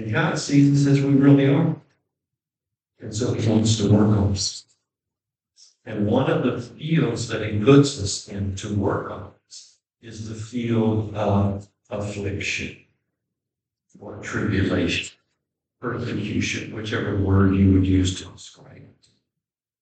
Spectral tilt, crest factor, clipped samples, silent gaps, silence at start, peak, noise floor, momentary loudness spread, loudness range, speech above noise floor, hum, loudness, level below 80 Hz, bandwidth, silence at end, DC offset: -6 dB/octave; 20 dB; under 0.1%; none; 0 s; -2 dBFS; -87 dBFS; 18 LU; 7 LU; 66 dB; none; -21 LUFS; -52 dBFS; 9 kHz; 1 s; under 0.1%